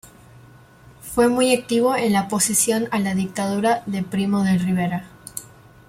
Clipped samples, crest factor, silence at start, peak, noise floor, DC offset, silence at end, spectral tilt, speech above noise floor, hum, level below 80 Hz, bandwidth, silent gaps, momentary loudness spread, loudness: under 0.1%; 16 dB; 0.05 s; -4 dBFS; -47 dBFS; under 0.1%; 0.45 s; -4.5 dB/octave; 28 dB; none; -54 dBFS; 16.5 kHz; none; 15 LU; -20 LUFS